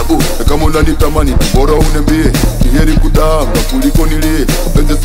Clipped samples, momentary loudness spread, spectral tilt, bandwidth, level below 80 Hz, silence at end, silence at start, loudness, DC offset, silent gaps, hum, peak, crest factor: under 0.1%; 2 LU; -5.5 dB/octave; 16.5 kHz; -10 dBFS; 0 s; 0 s; -12 LUFS; under 0.1%; none; none; 0 dBFS; 8 dB